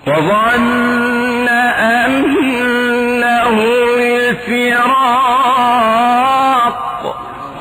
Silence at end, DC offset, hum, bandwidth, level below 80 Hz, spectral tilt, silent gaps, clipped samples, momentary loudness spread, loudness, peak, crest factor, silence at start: 0 s; under 0.1%; none; over 20 kHz; -46 dBFS; -4.5 dB/octave; none; under 0.1%; 4 LU; -12 LUFS; -4 dBFS; 8 dB; 0.05 s